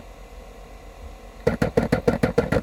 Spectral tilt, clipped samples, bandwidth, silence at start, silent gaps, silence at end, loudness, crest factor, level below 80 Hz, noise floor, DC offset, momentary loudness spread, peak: -7 dB/octave; under 0.1%; 16.5 kHz; 0 s; none; 0 s; -23 LUFS; 22 dB; -38 dBFS; -42 dBFS; under 0.1%; 22 LU; -2 dBFS